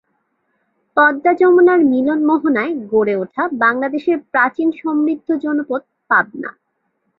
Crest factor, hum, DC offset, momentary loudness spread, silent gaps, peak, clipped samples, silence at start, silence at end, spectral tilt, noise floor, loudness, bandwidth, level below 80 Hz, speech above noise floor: 14 dB; none; under 0.1%; 10 LU; none; -2 dBFS; under 0.1%; 0.95 s; 0.7 s; -8.5 dB/octave; -68 dBFS; -16 LUFS; 4.7 kHz; -64 dBFS; 53 dB